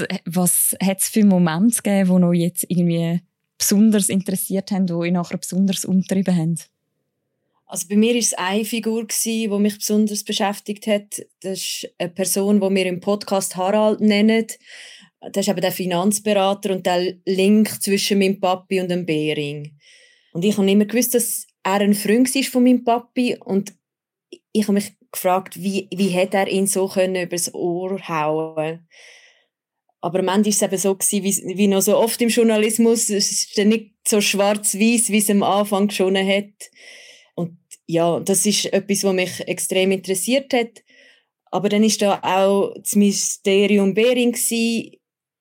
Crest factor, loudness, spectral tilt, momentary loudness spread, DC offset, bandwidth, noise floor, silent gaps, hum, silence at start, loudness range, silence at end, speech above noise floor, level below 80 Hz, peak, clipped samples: 14 dB; -19 LUFS; -4.5 dB/octave; 9 LU; under 0.1%; 17 kHz; -86 dBFS; none; none; 0 s; 4 LU; 0.55 s; 67 dB; -78 dBFS; -6 dBFS; under 0.1%